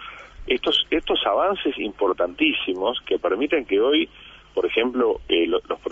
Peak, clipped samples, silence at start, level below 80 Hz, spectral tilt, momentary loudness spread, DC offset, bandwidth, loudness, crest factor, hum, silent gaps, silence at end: -6 dBFS; under 0.1%; 0 s; -48 dBFS; -5 dB/octave; 6 LU; under 0.1%; 7.8 kHz; -22 LUFS; 16 dB; none; none; 0 s